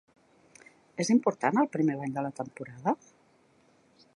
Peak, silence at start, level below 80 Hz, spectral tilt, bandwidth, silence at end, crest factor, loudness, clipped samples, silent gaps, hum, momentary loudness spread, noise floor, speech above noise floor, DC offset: -10 dBFS; 1 s; -78 dBFS; -5.5 dB/octave; 11.5 kHz; 1.2 s; 22 dB; -29 LUFS; under 0.1%; none; none; 13 LU; -64 dBFS; 36 dB; under 0.1%